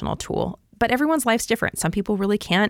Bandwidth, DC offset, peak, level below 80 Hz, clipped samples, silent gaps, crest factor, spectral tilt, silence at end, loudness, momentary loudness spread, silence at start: 17.5 kHz; under 0.1%; -6 dBFS; -44 dBFS; under 0.1%; none; 16 dB; -4.5 dB/octave; 0 s; -22 LUFS; 7 LU; 0 s